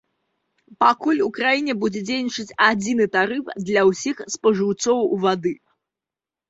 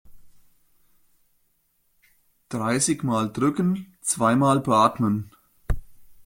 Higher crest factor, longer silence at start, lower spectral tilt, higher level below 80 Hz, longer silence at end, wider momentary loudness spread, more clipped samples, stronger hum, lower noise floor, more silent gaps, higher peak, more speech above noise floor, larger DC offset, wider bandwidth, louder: about the same, 20 dB vs 20 dB; first, 0.7 s vs 0.1 s; about the same, -4 dB/octave vs -5 dB/octave; second, -64 dBFS vs -40 dBFS; first, 0.95 s vs 0.05 s; second, 8 LU vs 14 LU; neither; neither; first, -89 dBFS vs -68 dBFS; neither; first, -2 dBFS vs -6 dBFS; first, 69 dB vs 46 dB; neither; second, 8 kHz vs 16.5 kHz; first, -20 LUFS vs -23 LUFS